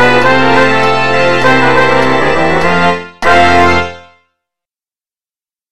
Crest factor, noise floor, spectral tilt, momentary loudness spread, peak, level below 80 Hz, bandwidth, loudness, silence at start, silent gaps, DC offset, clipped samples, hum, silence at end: 10 dB; under -90 dBFS; -5 dB/octave; 5 LU; 0 dBFS; -38 dBFS; 16 kHz; -9 LUFS; 0 s; none; 10%; under 0.1%; none; 0 s